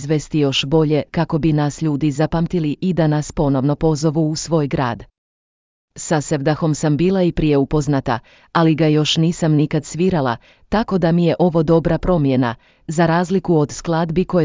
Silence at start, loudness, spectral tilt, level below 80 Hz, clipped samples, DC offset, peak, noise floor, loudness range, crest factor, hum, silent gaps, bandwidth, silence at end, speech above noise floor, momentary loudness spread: 0 s; -18 LUFS; -6.5 dB/octave; -38 dBFS; under 0.1%; under 0.1%; -2 dBFS; under -90 dBFS; 3 LU; 14 dB; none; 5.18-5.88 s; 7.6 kHz; 0 s; over 73 dB; 6 LU